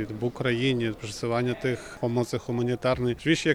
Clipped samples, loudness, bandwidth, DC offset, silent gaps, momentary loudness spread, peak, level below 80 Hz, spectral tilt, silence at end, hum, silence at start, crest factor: under 0.1%; -27 LUFS; 14 kHz; under 0.1%; none; 6 LU; -10 dBFS; -52 dBFS; -5.5 dB/octave; 0 s; none; 0 s; 18 dB